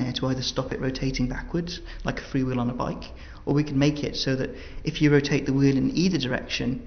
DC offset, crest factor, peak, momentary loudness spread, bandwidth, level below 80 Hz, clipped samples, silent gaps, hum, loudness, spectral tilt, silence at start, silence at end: under 0.1%; 18 dB; -8 dBFS; 11 LU; 6.6 kHz; -40 dBFS; under 0.1%; none; none; -26 LUFS; -6 dB/octave; 0 s; 0 s